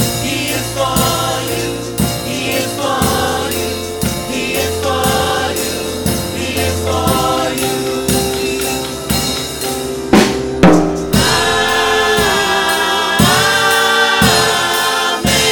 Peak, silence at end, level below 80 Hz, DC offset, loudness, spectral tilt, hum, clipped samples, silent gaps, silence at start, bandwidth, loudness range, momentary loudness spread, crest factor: 0 dBFS; 0 s; -32 dBFS; under 0.1%; -14 LUFS; -3.5 dB/octave; none; under 0.1%; none; 0 s; 17.5 kHz; 5 LU; 8 LU; 14 dB